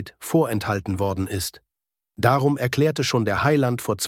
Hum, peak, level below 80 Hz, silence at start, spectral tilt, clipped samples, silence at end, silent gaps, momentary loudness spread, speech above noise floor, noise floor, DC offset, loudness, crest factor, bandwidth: none; -4 dBFS; -52 dBFS; 0 s; -5.5 dB/octave; under 0.1%; 0 s; none; 6 LU; 61 dB; -83 dBFS; under 0.1%; -22 LUFS; 18 dB; 17 kHz